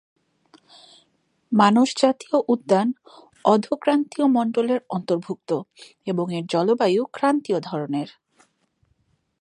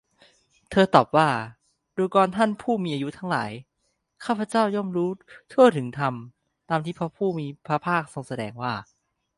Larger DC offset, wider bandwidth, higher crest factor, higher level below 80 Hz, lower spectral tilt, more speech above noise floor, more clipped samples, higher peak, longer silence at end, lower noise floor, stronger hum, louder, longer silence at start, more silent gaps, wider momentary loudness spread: neither; about the same, 11 kHz vs 11.5 kHz; about the same, 20 dB vs 24 dB; second, -74 dBFS vs -62 dBFS; about the same, -6 dB/octave vs -6.5 dB/octave; second, 46 dB vs 51 dB; neither; about the same, -2 dBFS vs 0 dBFS; first, 1.3 s vs 0.55 s; second, -67 dBFS vs -74 dBFS; neither; about the same, -22 LUFS vs -24 LUFS; first, 1.5 s vs 0.7 s; neither; second, 10 LU vs 16 LU